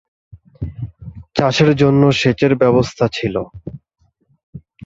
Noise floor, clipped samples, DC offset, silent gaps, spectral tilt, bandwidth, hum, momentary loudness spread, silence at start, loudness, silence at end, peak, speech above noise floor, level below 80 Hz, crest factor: -62 dBFS; under 0.1%; under 0.1%; 4.43-4.53 s; -6.5 dB/octave; 7.8 kHz; none; 19 LU; 0.6 s; -15 LUFS; 0.3 s; 0 dBFS; 48 dB; -42 dBFS; 18 dB